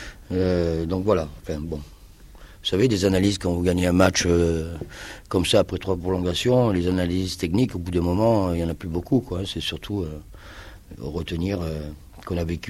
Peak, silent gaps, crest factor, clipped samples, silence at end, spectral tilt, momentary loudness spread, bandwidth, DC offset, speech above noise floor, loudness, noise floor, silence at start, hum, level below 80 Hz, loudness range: -2 dBFS; none; 22 dB; under 0.1%; 0 s; -5.5 dB/octave; 16 LU; 15.5 kHz; under 0.1%; 22 dB; -23 LUFS; -45 dBFS; 0 s; none; -42 dBFS; 7 LU